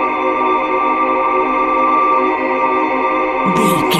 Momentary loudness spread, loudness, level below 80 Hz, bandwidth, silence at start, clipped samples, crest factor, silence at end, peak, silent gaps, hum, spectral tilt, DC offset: 3 LU; -14 LUFS; -46 dBFS; 16 kHz; 0 s; under 0.1%; 14 dB; 0 s; 0 dBFS; none; none; -5 dB/octave; under 0.1%